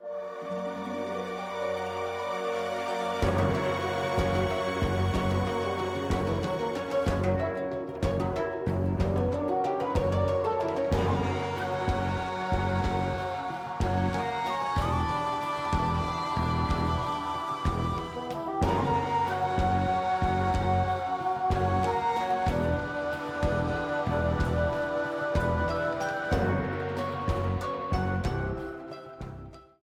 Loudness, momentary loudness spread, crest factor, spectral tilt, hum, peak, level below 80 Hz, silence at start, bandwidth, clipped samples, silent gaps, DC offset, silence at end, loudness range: -29 LUFS; 6 LU; 14 dB; -6.5 dB/octave; none; -14 dBFS; -42 dBFS; 0 s; 14 kHz; under 0.1%; none; under 0.1%; 0.2 s; 2 LU